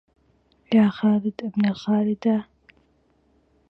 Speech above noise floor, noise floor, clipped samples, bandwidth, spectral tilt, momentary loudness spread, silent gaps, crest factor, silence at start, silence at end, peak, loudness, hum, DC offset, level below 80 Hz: 42 dB; -63 dBFS; under 0.1%; 6 kHz; -8.5 dB/octave; 5 LU; none; 18 dB; 0.7 s; 1.25 s; -6 dBFS; -22 LUFS; none; under 0.1%; -62 dBFS